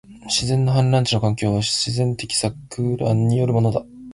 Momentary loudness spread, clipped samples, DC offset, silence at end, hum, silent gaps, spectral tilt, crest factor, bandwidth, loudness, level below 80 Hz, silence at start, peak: 5 LU; under 0.1%; under 0.1%; 0 s; none; none; -5 dB/octave; 14 dB; 11.5 kHz; -20 LUFS; -46 dBFS; 0.1 s; -6 dBFS